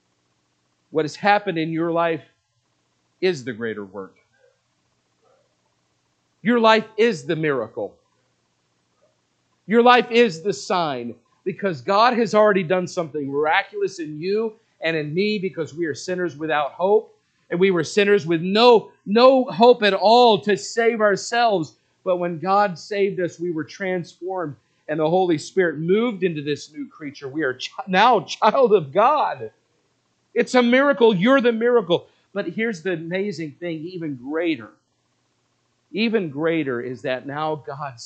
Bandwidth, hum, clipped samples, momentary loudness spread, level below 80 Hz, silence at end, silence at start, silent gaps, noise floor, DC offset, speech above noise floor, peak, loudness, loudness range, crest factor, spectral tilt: 8.8 kHz; none; under 0.1%; 15 LU; -76 dBFS; 0 s; 0.9 s; none; -69 dBFS; under 0.1%; 49 dB; 0 dBFS; -20 LUFS; 10 LU; 20 dB; -5 dB/octave